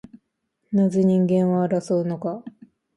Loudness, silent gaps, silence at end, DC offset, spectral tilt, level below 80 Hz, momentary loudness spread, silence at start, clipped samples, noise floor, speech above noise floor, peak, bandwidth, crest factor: -21 LUFS; none; 0.5 s; under 0.1%; -9 dB/octave; -66 dBFS; 11 LU; 0.7 s; under 0.1%; -75 dBFS; 54 dB; -10 dBFS; 10 kHz; 14 dB